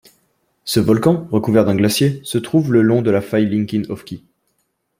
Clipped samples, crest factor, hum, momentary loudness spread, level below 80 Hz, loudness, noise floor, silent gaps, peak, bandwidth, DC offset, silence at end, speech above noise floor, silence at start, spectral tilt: under 0.1%; 16 dB; none; 14 LU; -52 dBFS; -16 LUFS; -68 dBFS; none; -2 dBFS; 16.5 kHz; under 0.1%; 0.8 s; 53 dB; 0.65 s; -6 dB/octave